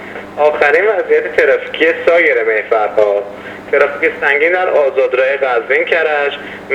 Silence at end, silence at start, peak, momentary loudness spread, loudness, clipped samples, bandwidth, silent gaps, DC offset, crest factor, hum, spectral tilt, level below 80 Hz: 0 s; 0 s; 0 dBFS; 6 LU; -12 LUFS; under 0.1%; 8.6 kHz; none; under 0.1%; 12 dB; none; -4.5 dB/octave; -54 dBFS